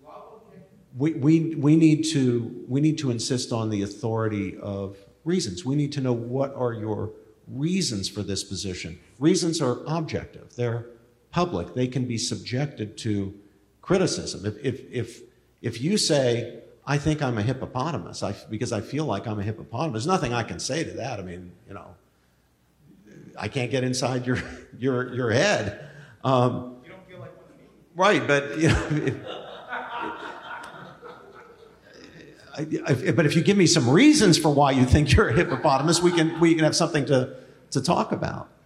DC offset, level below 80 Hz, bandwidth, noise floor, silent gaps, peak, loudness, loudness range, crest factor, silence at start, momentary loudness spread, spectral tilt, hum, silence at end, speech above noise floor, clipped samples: under 0.1%; -46 dBFS; 13.5 kHz; -63 dBFS; none; -6 dBFS; -24 LUFS; 11 LU; 18 dB; 0.05 s; 18 LU; -5 dB/octave; none; 0.2 s; 40 dB; under 0.1%